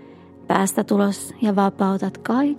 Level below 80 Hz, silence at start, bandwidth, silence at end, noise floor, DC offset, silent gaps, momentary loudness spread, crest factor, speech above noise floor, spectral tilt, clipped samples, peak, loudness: -68 dBFS; 0 s; 15.5 kHz; 0 s; -43 dBFS; under 0.1%; none; 4 LU; 20 dB; 23 dB; -6 dB/octave; under 0.1%; 0 dBFS; -21 LUFS